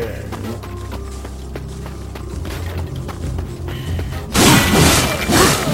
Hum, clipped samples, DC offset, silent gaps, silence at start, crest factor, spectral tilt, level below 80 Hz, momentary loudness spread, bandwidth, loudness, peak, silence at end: none; under 0.1%; under 0.1%; none; 0 s; 18 dB; -4 dB/octave; -30 dBFS; 19 LU; 16.5 kHz; -16 LUFS; 0 dBFS; 0 s